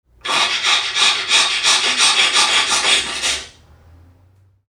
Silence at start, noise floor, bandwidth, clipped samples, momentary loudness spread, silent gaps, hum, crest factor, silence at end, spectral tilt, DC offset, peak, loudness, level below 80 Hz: 0.25 s; -53 dBFS; 19 kHz; under 0.1%; 7 LU; none; none; 18 dB; 1.2 s; 1.5 dB/octave; under 0.1%; 0 dBFS; -13 LUFS; -52 dBFS